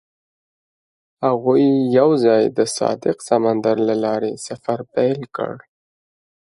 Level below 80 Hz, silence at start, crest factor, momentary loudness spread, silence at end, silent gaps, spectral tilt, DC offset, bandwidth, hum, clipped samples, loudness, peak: -66 dBFS; 1.2 s; 16 dB; 11 LU; 1 s; none; -6 dB/octave; under 0.1%; 11.5 kHz; none; under 0.1%; -18 LUFS; -2 dBFS